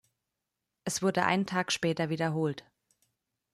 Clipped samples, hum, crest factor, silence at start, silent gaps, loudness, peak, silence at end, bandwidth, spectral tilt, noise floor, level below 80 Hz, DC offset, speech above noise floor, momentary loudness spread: under 0.1%; none; 22 dB; 0.85 s; none; -30 LUFS; -10 dBFS; 0.95 s; 14 kHz; -4.5 dB/octave; -86 dBFS; -72 dBFS; under 0.1%; 56 dB; 7 LU